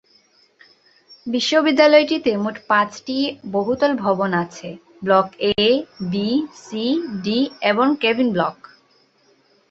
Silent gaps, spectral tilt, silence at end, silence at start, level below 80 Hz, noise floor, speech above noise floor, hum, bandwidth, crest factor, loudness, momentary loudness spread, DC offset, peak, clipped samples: none; -5 dB/octave; 1.2 s; 1.1 s; -60 dBFS; -58 dBFS; 40 dB; none; 8 kHz; 18 dB; -19 LUFS; 11 LU; under 0.1%; -2 dBFS; under 0.1%